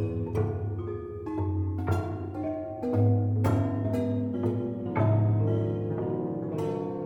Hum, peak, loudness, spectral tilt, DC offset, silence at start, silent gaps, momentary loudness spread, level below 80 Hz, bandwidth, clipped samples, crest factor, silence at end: none; -14 dBFS; -29 LUFS; -10 dB/octave; under 0.1%; 0 s; none; 9 LU; -52 dBFS; 4.4 kHz; under 0.1%; 14 dB; 0 s